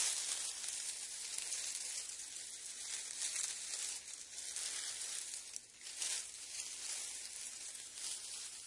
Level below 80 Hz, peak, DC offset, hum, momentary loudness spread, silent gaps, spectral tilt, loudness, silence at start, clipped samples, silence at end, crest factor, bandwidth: -82 dBFS; -18 dBFS; under 0.1%; none; 7 LU; none; 3 dB/octave; -42 LUFS; 0 s; under 0.1%; 0 s; 26 dB; 12 kHz